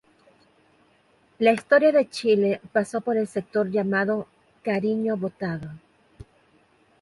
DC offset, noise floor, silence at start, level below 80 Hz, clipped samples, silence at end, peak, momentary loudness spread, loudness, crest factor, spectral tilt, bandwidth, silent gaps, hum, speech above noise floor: under 0.1%; -61 dBFS; 1.4 s; -62 dBFS; under 0.1%; 1.25 s; -6 dBFS; 13 LU; -24 LUFS; 20 dB; -6.5 dB/octave; 11.5 kHz; none; none; 39 dB